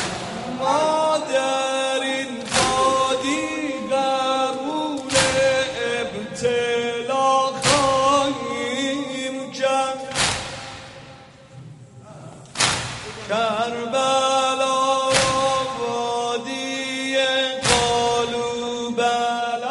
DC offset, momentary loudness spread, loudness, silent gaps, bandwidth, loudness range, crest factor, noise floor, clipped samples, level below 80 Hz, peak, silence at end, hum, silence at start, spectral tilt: under 0.1%; 9 LU; -21 LUFS; none; 11.5 kHz; 5 LU; 20 dB; -44 dBFS; under 0.1%; -50 dBFS; -2 dBFS; 0 s; none; 0 s; -2.5 dB/octave